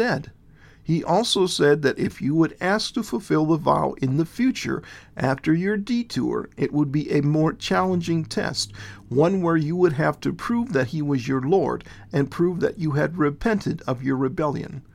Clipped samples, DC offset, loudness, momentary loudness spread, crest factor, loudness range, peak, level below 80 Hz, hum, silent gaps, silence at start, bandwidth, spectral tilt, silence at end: under 0.1%; under 0.1%; -23 LUFS; 7 LU; 18 dB; 2 LU; -4 dBFS; -50 dBFS; none; none; 0 s; 14.5 kHz; -6 dB/octave; 0.15 s